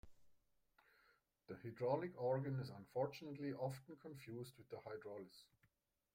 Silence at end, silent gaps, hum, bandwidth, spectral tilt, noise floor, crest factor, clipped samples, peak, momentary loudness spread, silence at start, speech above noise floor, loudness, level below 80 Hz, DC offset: 0.7 s; none; none; 16 kHz; -7.5 dB/octave; -84 dBFS; 22 dB; under 0.1%; -28 dBFS; 14 LU; 0.05 s; 37 dB; -47 LUFS; -80 dBFS; under 0.1%